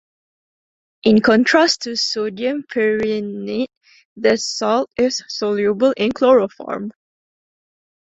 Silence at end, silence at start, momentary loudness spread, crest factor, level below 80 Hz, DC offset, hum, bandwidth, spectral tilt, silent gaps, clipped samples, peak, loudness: 1.1 s; 1.05 s; 12 LU; 18 dB; -58 dBFS; under 0.1%; none; 8 kHz; -4 dB/octave; 3.77-3.81 s, 4.05-4.16 s; under 0.1%; -2 dBFS; -18 LUFS